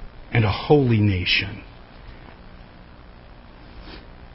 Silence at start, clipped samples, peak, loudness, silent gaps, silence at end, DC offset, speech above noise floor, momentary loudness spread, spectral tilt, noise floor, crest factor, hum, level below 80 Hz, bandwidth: 0 s; under 0.1%; -2 dBFS; -20 LUFS; none; 0.1 s; under 0.1%; 25 dB; 26 LU; -10.5 dB/octave; -44 dBFS; 22 dB; 60 Hz at -50 dBFS; -40 dBFS; 5.8 kHz